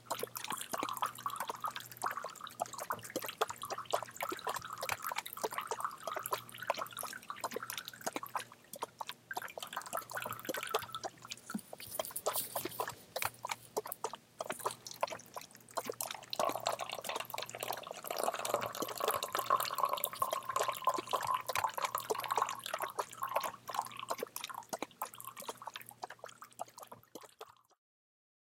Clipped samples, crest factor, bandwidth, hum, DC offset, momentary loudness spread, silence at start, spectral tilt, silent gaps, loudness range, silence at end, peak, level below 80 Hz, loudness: under 0.1%; 28 dB; 17 kHz; none; under 0.1%; 11 LU; 0 s; -1.5 dB/octave; none; 7 LU; 1 s; -12 dBFS; -80 dBFS; -40 LUFS